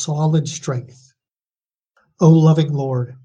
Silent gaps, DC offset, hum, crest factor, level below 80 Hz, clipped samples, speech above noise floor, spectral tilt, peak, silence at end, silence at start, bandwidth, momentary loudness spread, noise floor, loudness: none; under 0.1%; none; 16 dB; -60 dBFS; under 0.1%; over 74 dB; -7.5 dB/octave; 0 dBFS; 0.1 s; 0 s; 8 kHz; 13 LU; under -90 dBFS; -17 LUFS